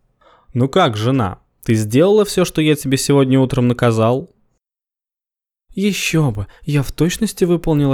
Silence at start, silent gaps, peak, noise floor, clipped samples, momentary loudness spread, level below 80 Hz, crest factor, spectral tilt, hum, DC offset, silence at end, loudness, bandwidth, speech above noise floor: 0.55 s; none; -2 dBFS; -90 dBFS; under 0.1%; 8 LU; -40 dBFS; 14 dB; -6 dB/octave; none; under 0.1%; 0 s; -16 LUFS; 17.5 kHz; 75 dB